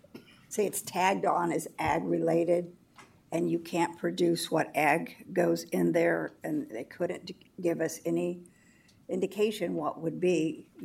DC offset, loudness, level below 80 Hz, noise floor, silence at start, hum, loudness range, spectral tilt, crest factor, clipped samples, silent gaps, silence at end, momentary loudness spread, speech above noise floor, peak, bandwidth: under 0.1%; -30 LUFS; -68 dBFS; -61 dBFS; 0.15 s; none; 4 LU; -5 dB/octave; 20 dB; under 0.1%; none; 0 s; 9 LU; 31 dB; -12 dBFS; 16.5 kHz